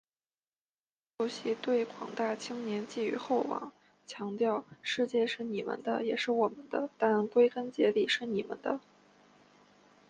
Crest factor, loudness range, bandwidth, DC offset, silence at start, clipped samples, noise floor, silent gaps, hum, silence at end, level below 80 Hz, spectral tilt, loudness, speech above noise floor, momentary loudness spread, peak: 18 dB; 4 LU; 9.4 kHz; under 0.1%; 1.2 s; under 0.1%; under -90 dBFS; none; none; 1.3 s; -80 dBFS; -4.5 dB/octave; -32 LUFS; over 58 dB; 9 LU; -14 dBFS